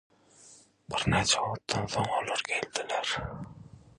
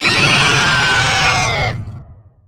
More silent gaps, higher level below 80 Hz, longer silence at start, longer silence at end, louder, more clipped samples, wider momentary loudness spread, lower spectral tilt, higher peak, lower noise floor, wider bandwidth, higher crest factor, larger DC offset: neither; second, -52 dBFS vs -34 dBFS; first, 0.4 s vs 0 s; second, 0.1 s vs 0.35 s; second, -30 LUFS vs -12 LUFS; neither; about the same, 11 LU vs 12 LU; about the same, -3 dB/octave vs -2.5 dB/octave; second, -10 dBFS vs -2 dBFS; first, -57 dBFS vs -38 dBFS; second, 11.5 kHz vs over 20 kHz; first, 22 dB vs 12 dB; neither